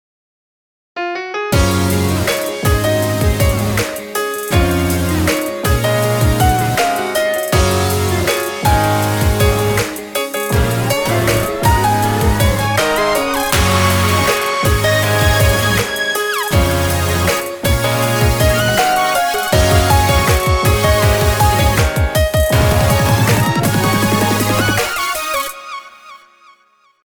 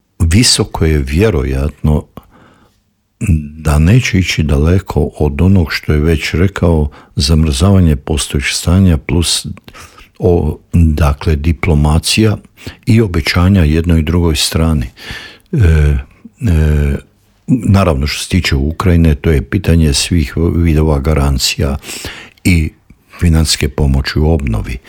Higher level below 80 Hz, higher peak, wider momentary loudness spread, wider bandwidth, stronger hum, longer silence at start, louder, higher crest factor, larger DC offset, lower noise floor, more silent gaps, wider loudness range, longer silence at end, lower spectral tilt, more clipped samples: about the same, -24 dBFS vs -20 dBFS; about the same, 0 dBFS vs 0 dBFS; second, 5 LU vs 8 LU; first, over 20 kHz vs 17 kHz; neither; first, 0.95 s vs 0.2 s; about the same, -14 LUFS vs -12 LUFS; about the same, 14 dB vs 12 dB; second, under 0.1% vs 0.2%; second, -54 dBFS vs -58 dBFS; neither; about the same, 3 LU vs 2 LU; first, 0.9 s vs 0.1 s; about the same, -4.5 dB/octave vs -5.5 dB/octave; neither